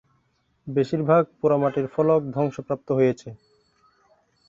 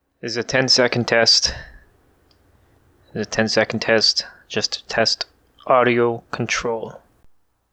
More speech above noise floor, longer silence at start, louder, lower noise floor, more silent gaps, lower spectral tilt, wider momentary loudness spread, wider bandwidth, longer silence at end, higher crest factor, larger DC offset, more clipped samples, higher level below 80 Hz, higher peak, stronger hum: first, 46 dB vs 38 dB; first, 0.65 s vs 0.25 s; second, -23 LUFS vs -18 LUFS; first, -68 dBFS vs -57 dBFS; neither; first, -8.5 dB/octave vs -3 dB/octave; second, 11 LU vs 15 LU; second, 7.6 kHz vs 10.5 kHz; first, 1.15 s vs 0.75 s; about the same, 20 dB vs 18 dB; neither; neither; second, -62 dBFS vs -50 dBFS; about the same, -6 dBFS vs -4 dBFS; neither